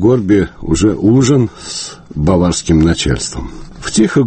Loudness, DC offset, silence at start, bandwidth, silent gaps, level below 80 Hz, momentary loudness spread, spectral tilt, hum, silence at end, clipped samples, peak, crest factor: -13 LUFS; under 0.1%; 0 s; 8.8 kHz; none; -28 dBFS; 13 LU; -5.5 dB/octave; none; 0 s; under 0.1%; 0 dBFS; 12 dB